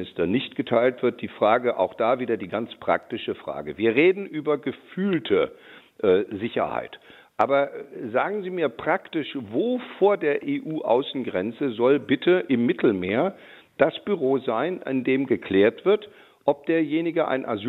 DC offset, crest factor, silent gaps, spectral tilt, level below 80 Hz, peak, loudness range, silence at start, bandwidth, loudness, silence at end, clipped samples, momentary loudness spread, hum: under 0.1%; 20 dB; none; -8 dB/octave; -68 dBFS; -4 dBFS; 3 LU; 0 s; 4.2 kHz; -24 LUFS; 0 s; under 0.1%; 8 LU; none